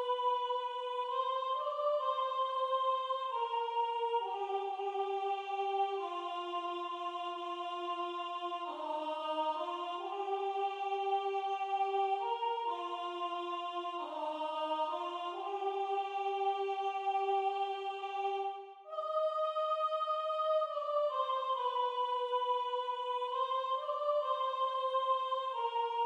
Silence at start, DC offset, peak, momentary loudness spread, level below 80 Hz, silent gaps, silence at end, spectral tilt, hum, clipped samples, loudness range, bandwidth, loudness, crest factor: 0 s; under 0.1%; -22 dBFS; 6 LU; under -90 dBFS; none; 0 s; -1 dB/octave; none; under 0.1%; 4 LU; 9.8 kHz; -36 LUFS; 14 dB